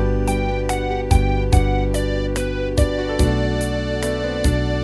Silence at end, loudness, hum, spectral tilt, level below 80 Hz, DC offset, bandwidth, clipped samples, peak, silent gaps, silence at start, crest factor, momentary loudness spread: 0 s; -20 LUFS; none; -6 dB/octave; -22 dBFS; 0.1%; 11 kHz; under 0.1%; -2 dBFS; none; 0 s; 16 dB; 4 LU